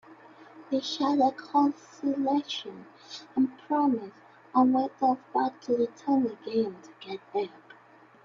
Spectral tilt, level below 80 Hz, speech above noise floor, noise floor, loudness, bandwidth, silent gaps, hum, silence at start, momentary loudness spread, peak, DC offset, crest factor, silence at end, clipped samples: -5 dB/octave; -76 dBFS; 28 dB; -56 dBFS; -28 LUFS; 7.4 kHz; none; none; 0.1 s; 16 LU; -10 dBFS; under 0.1%; 18 dB; 0.75 s; under 0.1%